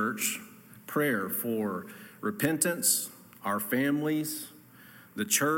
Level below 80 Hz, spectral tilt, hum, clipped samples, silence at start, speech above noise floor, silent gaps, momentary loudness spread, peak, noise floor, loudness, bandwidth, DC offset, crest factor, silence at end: -74 dBFS; -3 dB/octave; none; under 0.1%; 0 s; 24 dB; none; 15 LU; -10 dBFS; -53 dBFS; -30 LUFS; 17 kHz; under 0.1%; 20 dB; 0 s